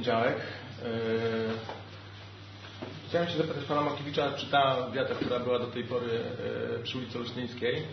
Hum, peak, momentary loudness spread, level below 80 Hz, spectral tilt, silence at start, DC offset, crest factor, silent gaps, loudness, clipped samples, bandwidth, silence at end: none; -12 dBFS; 15 LU; -66 dBFS; -6.5 dB/octave; 0 s; under 0.1%; 20 dB; none; -31 LUFS; under 0.1%; 6.4 kHz; 0 s